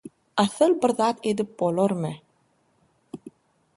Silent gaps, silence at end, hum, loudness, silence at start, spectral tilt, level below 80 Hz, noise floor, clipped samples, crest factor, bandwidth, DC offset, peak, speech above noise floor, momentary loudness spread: none; 0.5 s; none; -24 LUFS; 0.05 s; -5.5 dB/octave; -70 dBFS; -66 dBFS; under 0.1%; 20 dB; 11.5 kHz; under 0.1%; -6 dBFS; 44 dB; 22 LU